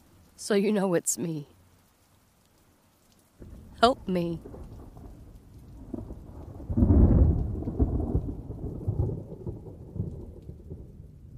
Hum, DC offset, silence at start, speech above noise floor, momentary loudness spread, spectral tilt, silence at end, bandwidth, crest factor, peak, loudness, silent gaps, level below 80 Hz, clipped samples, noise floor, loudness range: none; under 0.1%; 0.4 s; 36 dB; 25 LU; -6 dB/octave; 0 s; 15.5 kHz; 26 dB; -2 dBFS; -27 LUFS; none; -34 dBFS; under 0.1%; -63 dBFS; 7 LU